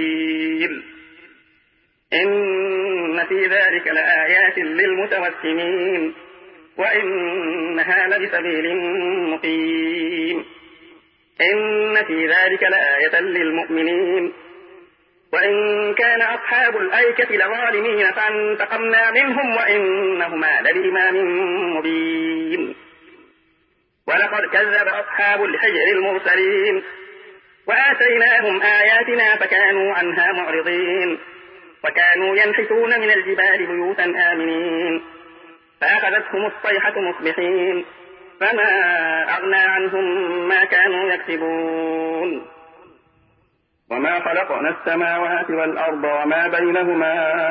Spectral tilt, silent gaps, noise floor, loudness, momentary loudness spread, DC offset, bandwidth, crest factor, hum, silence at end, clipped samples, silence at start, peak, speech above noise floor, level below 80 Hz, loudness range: -8.5 dB/octave; none; -64 dBFS; -17 LUFS; 8 LU; under 0.1%; 5.6 kHz; 16 dB; none; 0 s; under 0.1%; 0 s; -2 dBFS; 46 dB; -72 dBFS; 6 LU